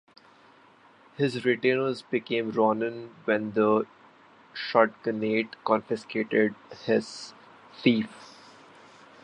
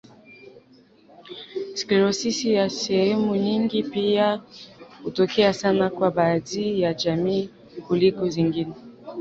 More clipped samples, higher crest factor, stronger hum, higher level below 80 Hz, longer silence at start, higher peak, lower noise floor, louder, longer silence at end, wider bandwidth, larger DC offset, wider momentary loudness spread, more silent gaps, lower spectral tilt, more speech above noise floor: neither; first, 24 dB vs 18 dB; neither; second, -74 dBFS vs -60 dBFS; first, 1.2 s vs 0.3 s; about the same, -6 dBFS vs -6 dBFS; about the same, -57 dBFS vs -54 dBFS; second, -27 LUFS vs -23 LUFS; first, 0.9 s vs 0 s; first, 10.5 kHz vs 8 kHz; neither; about the same, 14 LU vs 16 LU; neither; about the same, -6 dB/octave vs -5.5 dB/octave; about the same, 30 dB vs 32 dB